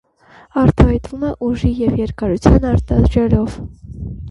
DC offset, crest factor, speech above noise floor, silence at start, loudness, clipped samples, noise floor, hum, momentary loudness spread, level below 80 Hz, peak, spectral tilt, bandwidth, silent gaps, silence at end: under 0.1%; 16 dB; 32 dB; 0.55 s; -16 LUFS; under 0.1%; -46 dBFS; none; 17 LU; -22 dBFS; 0 dBFS; -9 dB/octave; 11.5 kHz; none; 0 s